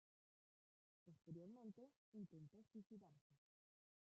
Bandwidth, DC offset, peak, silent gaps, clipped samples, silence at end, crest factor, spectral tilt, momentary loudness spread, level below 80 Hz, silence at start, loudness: 7.4 kHz; under 0.1%; -46 dBFS; 1.96-2.12 s, 3.21-3.30 s; under 0.1%; 0.8 s; 18 dB; -10 dB/octave; 6 LU; under -90 dBFS; 1.05 s; -62 LUFS